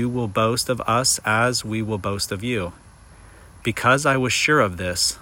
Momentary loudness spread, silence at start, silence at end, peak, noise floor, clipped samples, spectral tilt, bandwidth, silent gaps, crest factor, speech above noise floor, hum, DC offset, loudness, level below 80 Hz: 8 LU; 0 s; 0 s; -6 dBFS; -46 dBFS; under 0.1%; -3.5 dB/octave; 16.5 kHz; none; 16 dB; 25 dB; none; under 0.1%; -20 LUFS; -48 dBFS